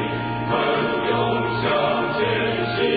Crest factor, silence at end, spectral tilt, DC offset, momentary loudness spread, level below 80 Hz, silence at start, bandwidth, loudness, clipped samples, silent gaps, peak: 14 dB; 0 s; -10.5 dB/octave; under 0.1%; 3 LU; -48 dBFS; 0 s; 5 kHz; -21 LUFS; under 0.1%; none; -8 dBFS